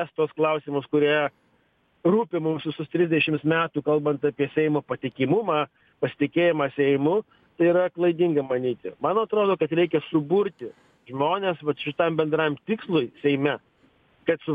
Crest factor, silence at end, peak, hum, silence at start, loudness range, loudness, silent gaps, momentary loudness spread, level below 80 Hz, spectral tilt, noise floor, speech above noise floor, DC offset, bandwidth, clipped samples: 16 dB; 0 s; -8 dBFS; none; 0 s; 2 LU; -24 LUFS; none; 8 LU; -68 dBFS; -9 dB/octave; -65 dBFS; 42 dB; under 0.1%; 4.9 kHz; under 0.1%